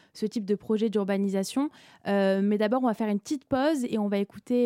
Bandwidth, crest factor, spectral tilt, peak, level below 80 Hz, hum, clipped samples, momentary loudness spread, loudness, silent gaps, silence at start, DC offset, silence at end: 15.5 kHz; 12 dB; -6.5 dB/octave; -14 dBFS; -66 dBFS; none; under 0.1%; 6 LU; -27 LUFS; none; 0.15 s; under 0.1%; 0 s